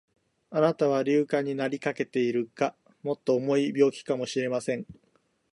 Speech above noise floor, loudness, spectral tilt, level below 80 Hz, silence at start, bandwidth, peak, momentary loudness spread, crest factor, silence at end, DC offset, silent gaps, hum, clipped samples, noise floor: 42 dB; -27 LUFS; -6 dB/octave; -72 dBFS; 0.5 s; 11.5 kHz; -10 dBFS; 9 LU; 18 dB; 0.6 s; under 0.1%; none; none; under 0.1%; -69 dBFS